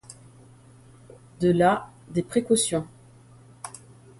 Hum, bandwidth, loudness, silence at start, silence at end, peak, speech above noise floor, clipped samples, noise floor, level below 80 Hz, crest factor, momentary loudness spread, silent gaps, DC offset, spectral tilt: none; 12 kHz; -24 LUFS; 0.1 s; 0.5 s; -8 dBFS; 29 dB; under 0.1%; -51 dBFS; -58 dBFS; 20 dB; 22 LU; none; under 0.1%; -5 dB/octave